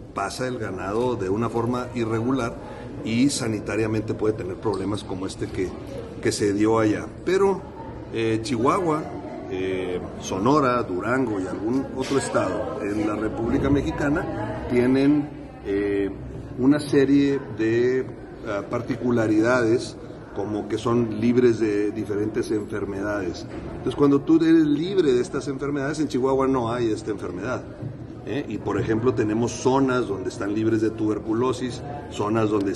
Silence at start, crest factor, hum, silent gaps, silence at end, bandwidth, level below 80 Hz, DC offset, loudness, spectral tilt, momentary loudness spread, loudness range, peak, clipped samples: 0 s; 16 dB; none; none; 0 s; 12 kHz; -46 dBFS; under 0.1%; -24 LUFS; -6.5 dB/octave; 11 LU; 4 LU; -6 dBFS; under 0.1%